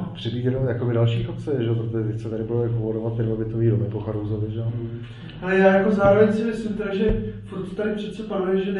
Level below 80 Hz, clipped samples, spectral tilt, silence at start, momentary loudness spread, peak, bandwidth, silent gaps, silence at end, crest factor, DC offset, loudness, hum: -42 dBFS; under 0.1%; -8.5 dB/octave; 0 s; 12 LU; -4 dBFS; 8.4 kHz; none; 0 s; 18 dB; under 0.1%; -23 LUFS; none